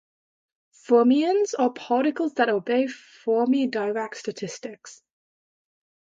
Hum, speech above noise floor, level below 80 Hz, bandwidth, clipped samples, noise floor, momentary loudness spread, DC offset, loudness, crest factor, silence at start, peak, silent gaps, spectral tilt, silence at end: none; over 67 dB; -78 dBFS; 7.8 kHz; under 0.1%; under -90 dBFS; 14 LU; under 0.1%; -23 LUFS; 18 dB; 0.9 s; -8 dBFS; none; -4.5 dB/octave; 1.25 s